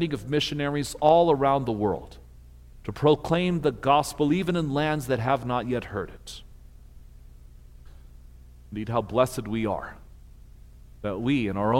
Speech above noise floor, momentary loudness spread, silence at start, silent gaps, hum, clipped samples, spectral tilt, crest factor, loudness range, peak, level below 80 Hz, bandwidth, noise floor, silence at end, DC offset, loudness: 23 dB; 15 LU; 0 s; none; 60 Hz at -45 dBFS; under 0.1%; -6 dB/octave; 20 dB; 10 LU; -6 dBFS; -48 dBFS; 16.5 kHz; -48 dBFS; 0 s; under 0.1%; -25 LUFS